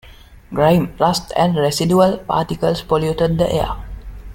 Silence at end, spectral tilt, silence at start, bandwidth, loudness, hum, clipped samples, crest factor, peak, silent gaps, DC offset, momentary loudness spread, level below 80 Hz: 0 s; -6 dB/octave; 0.05 s; 16.5 kHz; -17 LUFS; none; under 0.1%; 16 dB; -2 dBFS; none; under 0.1%; 11 LU; -36 dBFS